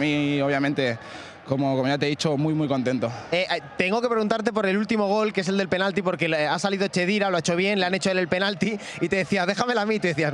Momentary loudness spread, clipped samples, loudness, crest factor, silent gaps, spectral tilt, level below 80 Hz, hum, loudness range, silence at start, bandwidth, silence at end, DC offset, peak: 4 LU; under 0.1%; -24 LUFS; 18 dB; none; -5 dB/octave; -62 dBFS; none; 2 LU; 0 s; 11.5 kHz; 0 s; under 0.1%; -4 dBFS